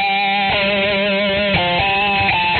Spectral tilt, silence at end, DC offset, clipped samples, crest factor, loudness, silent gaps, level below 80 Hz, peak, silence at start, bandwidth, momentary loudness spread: -1.5 dB/octave; 0 s; under 0.1%; under 0.1%; 12 dB; -15 LUFS; none; -40 dBFS; -4 dBFS; 0 s; 4.6 kHz; 1 LU